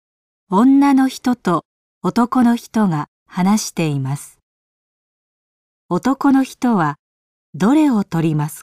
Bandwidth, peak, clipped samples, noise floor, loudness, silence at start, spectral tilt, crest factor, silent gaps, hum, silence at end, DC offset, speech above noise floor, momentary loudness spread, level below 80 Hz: 15.5 kHz; -4 dBFS; under 0.1%; under -90 dBFS; -17 LUFS; 0.5 s; -6.5 dB/octave; 12 dB; 1.65-2.01 s, 3.08-3.26 s, 4.43-5.89 s, 6.99-7.53 s; none; 0 s; 0.1%; over 74 dB; 11 LU; -58 dBFS